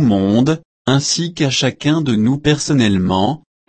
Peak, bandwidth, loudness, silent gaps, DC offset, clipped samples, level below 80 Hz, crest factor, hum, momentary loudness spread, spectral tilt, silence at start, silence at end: -2 dBFS; 8.8 kHz; -16 LUFS; 0.65-0.85 s; under 0.1%; under 0.1%; -46 dBFS; 14 dB; none; 4 LU; -5 dB/octave; 0 s; 0.3 s